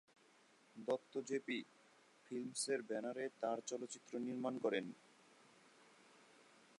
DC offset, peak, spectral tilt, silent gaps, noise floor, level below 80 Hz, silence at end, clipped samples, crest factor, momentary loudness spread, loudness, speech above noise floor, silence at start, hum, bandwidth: under 0.1%; -28 dBFS; -3.5 dB/octave; none; -71 dBFS; under -90 dBFS; 0.2 s; under 0.1%; 20 dB; 21 LU; -44 LUFS; 27 dB; 0.75 s; none; 11 kHz